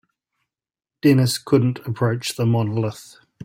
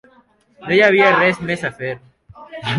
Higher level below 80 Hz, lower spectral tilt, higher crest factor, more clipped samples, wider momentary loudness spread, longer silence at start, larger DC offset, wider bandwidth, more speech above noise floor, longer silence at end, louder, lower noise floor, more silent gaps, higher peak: about the same, -56 dBFS vs -56 dBFS; about the same, -6 dB/octave vs -5.5 dB/octave; about the same, 16 dB vs 16 dB; neither; second, 8 LU vs 22 LU; first, 1.05 s vs 0.6 s; neither; first, 16.5 kHz vs 11.5 kHz; first, 58 dB vs 38 dB; first, 0.4 s vs 0 s; second, -20 LUFS vs -15 LUFS; first, -77 dBFS vs -54 dBFS; neither; about the same, -4 dBFS vs -2 dBFS